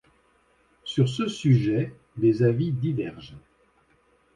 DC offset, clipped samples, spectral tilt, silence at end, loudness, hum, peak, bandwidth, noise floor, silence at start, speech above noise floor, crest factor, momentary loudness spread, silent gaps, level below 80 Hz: under 0.1%; under 0.1%; -7.5 dB/octave; 0.95 s; -25 LUFS; none; -10 dBFS; 10 kHz; -64 dBFS; 0.85 s; 40 dB; 16 dB; 16 LU; none; -58 dBFS